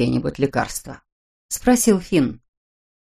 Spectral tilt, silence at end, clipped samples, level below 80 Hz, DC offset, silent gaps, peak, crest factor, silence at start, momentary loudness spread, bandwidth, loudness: -5 dB/octave; 0.75 s; under 0.1%; -44 dBFS; under 0.1%; 1.12-1.49 s; -2 dBFS; 20 dB; 0 s; 13 LU; 15.5 kHz; -20 LUFS